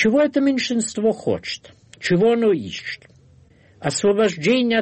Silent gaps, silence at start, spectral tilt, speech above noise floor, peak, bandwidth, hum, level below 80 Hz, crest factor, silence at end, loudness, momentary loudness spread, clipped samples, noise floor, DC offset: none; 0 s; -4.5 dB/octave; 32 dB; -6 dBFS; 8.8 kHz; none; -58 dBFS; 14 dB; 0 s; -20 LUFS; 13 LU; under 0.1%; -52 dBFS; under 0.1%